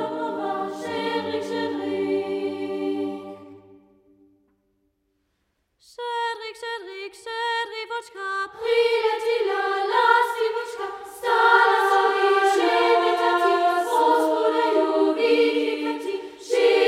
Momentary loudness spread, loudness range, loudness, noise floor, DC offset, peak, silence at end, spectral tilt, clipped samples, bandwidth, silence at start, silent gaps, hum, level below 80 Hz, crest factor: 13 LU; 15 LU; -22 LUFS; -73 dBFS; under 0.1%; -4 dBFS; 0 s; -3 dB/octave; under 0.1%; 15 kHz; 0 s; none; none; -72 dBFS; 18 dB